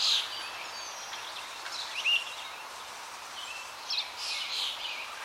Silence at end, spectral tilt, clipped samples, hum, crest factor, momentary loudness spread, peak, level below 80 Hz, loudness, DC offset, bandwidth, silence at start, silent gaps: 0 s; 2 dB/octave; under 0.1%; none; 20 dB; 14 LU; -16 dBFS; -76 dBFS; -33 LUFS; under 0.1%; 16 kHz; 0 s; none